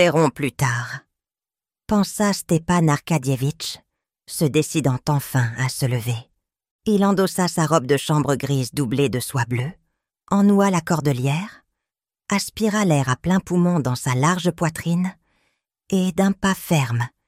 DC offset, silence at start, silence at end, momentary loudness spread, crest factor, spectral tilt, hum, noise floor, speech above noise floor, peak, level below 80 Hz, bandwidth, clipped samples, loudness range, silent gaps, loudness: under 0.1%; 0 s; 0.2 s; 8 LU; 18 dB; -5.5 dB/octave; none; under -90 dBFS; over 70 dB; -2 dBFS; -52 dBFS; 16 kHz; under 0.1%; 2 LU; 6.71-6.79 s; -21 LUFS